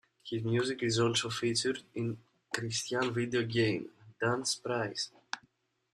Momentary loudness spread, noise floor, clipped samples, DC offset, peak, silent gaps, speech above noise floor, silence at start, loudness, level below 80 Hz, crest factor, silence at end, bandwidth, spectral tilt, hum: 10 LU; -71 dBFS; under 0.1%; under 0.1%; -14 dBFS; none; 39 dB; 0.25 s; -33 LUFS; -68 dBFS; 20 dB; 0.55 s; 13 kHz; -4 dB/octave; none